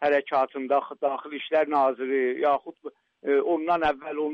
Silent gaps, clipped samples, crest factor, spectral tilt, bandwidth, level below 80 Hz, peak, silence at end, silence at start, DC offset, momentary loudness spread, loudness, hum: none; under 0.1%; 12 dB; -6 dB/octave; 6.2 kHz; -62 dBFS; -12 dBFS; 0 s; 0 s; under 0.1%; 10 LU; -25 LUFS; none